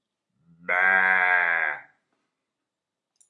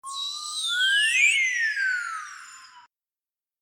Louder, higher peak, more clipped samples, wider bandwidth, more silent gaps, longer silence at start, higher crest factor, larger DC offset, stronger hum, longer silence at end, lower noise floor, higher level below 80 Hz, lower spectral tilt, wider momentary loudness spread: about the same, -21 LUFS vs -22 LUFS; about the same, -8 dBFS vs -10 dBFS; neither; second, 11 kHz vs 19.5 kHz; neither; first, 0.7 s vs 0.05 s; about the same, 20 dB vs 18 dB; neither; neither; first, 1.5 s vs 0.8 s; second, -86 dBFS vs under -90 dBFS; about the same, -90 dBFS vs under -90 dBFS; first, -3.5 dB/octave vs 7 dB/octave; about the same, 15 LU vs 17 LU